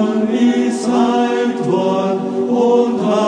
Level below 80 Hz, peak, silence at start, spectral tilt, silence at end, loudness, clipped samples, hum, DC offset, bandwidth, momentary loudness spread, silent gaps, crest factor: -62 dBFS; -4 dBFS; 0 s; -6 dB/octave; 0 s; -15 LUFS; under 0.1%; none; under 0.1%; 10 kHz; 4 LU; none; 12 dB